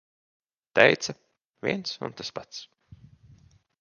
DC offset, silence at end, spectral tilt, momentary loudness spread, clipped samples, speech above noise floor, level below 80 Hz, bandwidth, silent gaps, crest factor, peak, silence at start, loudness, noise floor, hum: under 0.1%; 1.15 s; -3.5 dB/octave; 22 LU; under 0.1%; 32 dB; -66 dBFS; 10 kHz; 1.45-1.54 s; 30 dB; 0 dBFS; 0.75 s; -26 LUFS; -58 dBFS; none